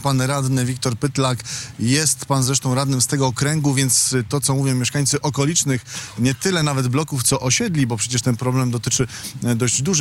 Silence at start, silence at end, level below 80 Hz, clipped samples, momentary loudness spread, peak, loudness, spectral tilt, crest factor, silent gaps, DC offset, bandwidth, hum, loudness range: 0 s; 0 s; -50 dBFS; under 0.1%; 5 LU; -8 dBFS; -19 LUFS; -4 dB/octave; 12 dB; none; under 0.1%; 16.5 kHz; none; 2 LU